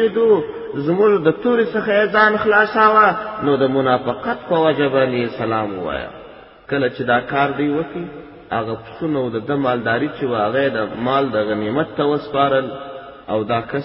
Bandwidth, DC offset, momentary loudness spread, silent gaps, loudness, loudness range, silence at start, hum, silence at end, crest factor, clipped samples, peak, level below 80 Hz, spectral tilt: 5.8 kHz; under 0.1%; 12 LU; none; -18 LUFS; 6 LU; 0 s; none; 0 s; 18 dB; under 0.1%; 0 dBFS; -52 dBFS; -11 dB/octave